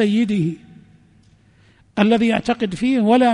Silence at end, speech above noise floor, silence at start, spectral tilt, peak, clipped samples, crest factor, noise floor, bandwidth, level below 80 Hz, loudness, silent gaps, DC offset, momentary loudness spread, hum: 0 s; 36 dB; 0 s; -6.5 dB/octave; -4 dBFS; under 0.1%; 16 dB; -53 dBFS; 10.5 kHz; -54 dBFS; -18 LUFS; none; under 0.1%; 10 LU; none